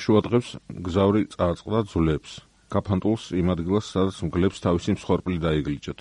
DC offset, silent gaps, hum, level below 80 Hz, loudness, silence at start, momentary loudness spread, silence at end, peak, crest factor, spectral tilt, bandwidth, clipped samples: under 0.1%; none; none; -44 dBFS; -25 LUFS; 0 s; 9 LU; 0.1 s; -6 dBFS; 18 dB; -7.5 dB/octave; 11 kHz; under 0.1%